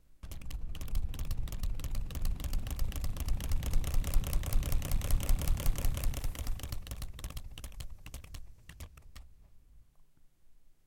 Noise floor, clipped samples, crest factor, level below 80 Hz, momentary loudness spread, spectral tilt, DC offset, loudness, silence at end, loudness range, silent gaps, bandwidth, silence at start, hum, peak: -59 dBFS; under 0.1%; 18 dB; -34 dBFS; 16 LU; -4.5 dB/octave; under 0.1%; -39 LUFS; 0.35 s; 14 LU; none; 17 kHz; 0.1 s; none; -14 dBFS